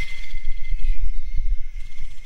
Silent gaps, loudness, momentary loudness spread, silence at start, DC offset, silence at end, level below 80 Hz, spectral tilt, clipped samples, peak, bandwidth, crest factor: none; -33 LUFS; 9 LU; 0 s; under 0.1%; 0 s; -22 dBFS; -4 dB/octave; under 0.1%; -6 dBFS; 4.5 kHz; 8 dB